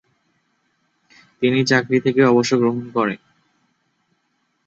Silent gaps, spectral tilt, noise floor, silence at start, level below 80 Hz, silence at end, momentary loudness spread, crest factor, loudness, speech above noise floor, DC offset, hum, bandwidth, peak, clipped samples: none; -5.5 dB/octave; -69 dBFS; 1.4 s; -64 dBFS; 1.5 s; 7 LU; 18 dB; -18 LUFS; 52 dB; under 0.1%; none; 8 kHz; -2 dBFS; under 0.1%